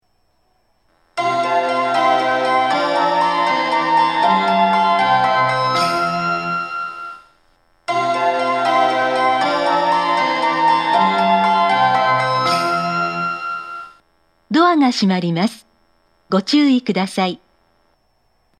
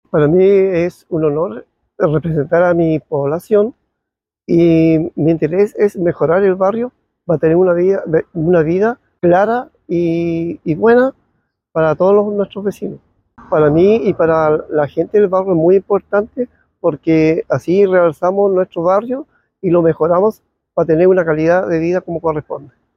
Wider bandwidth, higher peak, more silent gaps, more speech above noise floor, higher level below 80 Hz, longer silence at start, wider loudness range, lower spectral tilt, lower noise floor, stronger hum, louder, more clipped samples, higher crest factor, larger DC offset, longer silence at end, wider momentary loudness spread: first, 13 kHz vs 7.2 kHz; about the same, -2 dBFS vs -2 dBFS; neither; second, 47 dB vs 66 dB; second, -64 dBFS vs -50 dBFS; first, 1.15 s vs 0.15 s; about the same, 4 LU vs 2 LU; second, -5 dB/octave vs -9 dB/octave; second, -63 dBFS vs -80 dBFS; neither; about the same, -16 LUFS vs -14 LUFS; neither; about the same, 16 dB vs 12 dB; neither; first, 1.25 s vs 0.3 s; about the same, 8 LU vs 10 LU